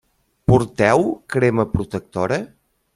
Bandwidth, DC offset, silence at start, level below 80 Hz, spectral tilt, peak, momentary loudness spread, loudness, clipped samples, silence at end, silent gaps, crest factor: 12 kHz; under 0.1%; 0.5 s; -42 dBFS; -7 dB/octave; -2 dBFS; 9 LU; -19 LUFS; under 0.1%; 0.5 s; none; 18 dB